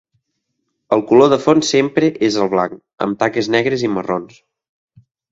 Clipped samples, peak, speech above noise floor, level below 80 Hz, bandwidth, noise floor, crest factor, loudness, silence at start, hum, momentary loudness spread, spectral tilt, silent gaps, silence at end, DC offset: under 0.1%; 0 dBFS; 57 dB; -56 dBFS; 8 kHz; -73 dBFS; 16 dB; -16 LUFS; 0.9 s; none; 12 LU; -5 dB/octave; none; 1.05 s; under 0.1%